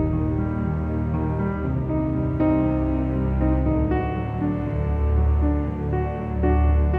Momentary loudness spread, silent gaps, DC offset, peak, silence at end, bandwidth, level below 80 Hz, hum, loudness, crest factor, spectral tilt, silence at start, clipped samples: 5 LU; none; under 0.1%; -10 dBFS; 0 s; 3.3 kHz; -26 dBFS; none; -23 LUFS; 12 dB; -11.5 dB/octave; 0 s; under 0.1%